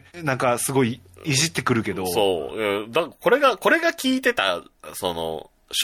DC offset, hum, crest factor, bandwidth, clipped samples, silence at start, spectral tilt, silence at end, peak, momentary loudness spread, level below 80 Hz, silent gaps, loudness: under 0.1%; none; 18 dB; 17.5 kHz; under 0.1%; 0.15 s; -3.5 dB/octave; 0 s; -6 dBFS; 11 LU; -58 dBFS; none; -22 LUFS